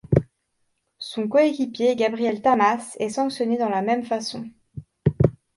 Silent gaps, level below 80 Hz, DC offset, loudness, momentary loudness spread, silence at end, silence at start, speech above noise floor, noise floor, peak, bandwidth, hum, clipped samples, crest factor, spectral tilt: none; -46 dBFS; under 0.1%; -23 LUFS; 14 LU; 0.25 s; 0.1 s; 50 dB; -72 dBFS; -2 dBFS; 11.5 kHz; none; under 0.1%; 22 dB; -6.5 dB/octave